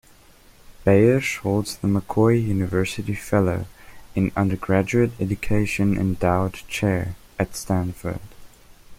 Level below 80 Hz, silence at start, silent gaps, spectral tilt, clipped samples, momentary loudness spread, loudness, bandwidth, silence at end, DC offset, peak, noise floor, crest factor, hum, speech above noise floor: -42 dBFS; 0.7 s; none; -6.5 dB/octave; under 0.1%; 10 LU; -22 LUFS; 16 kHz; 0.05 s; under 0.1%; -4 dBFS; -51 dBFS; 20 dB; none; 30 dB